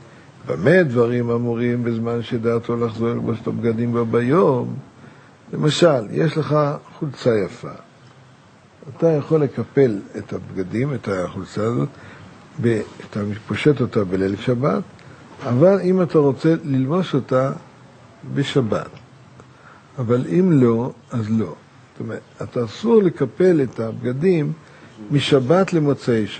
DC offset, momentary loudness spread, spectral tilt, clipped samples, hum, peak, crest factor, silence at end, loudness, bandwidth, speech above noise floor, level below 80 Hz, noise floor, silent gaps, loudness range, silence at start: under 0.1%; 14 LU; -7.5 dB/octave; under 0.1%; none; -2 dBFS; 18 dB; 0 s; -20 LUFS; 9 kHz; 30 dB; -60 dBFS; -49 dBFS; none; 4 LU; 0.45 s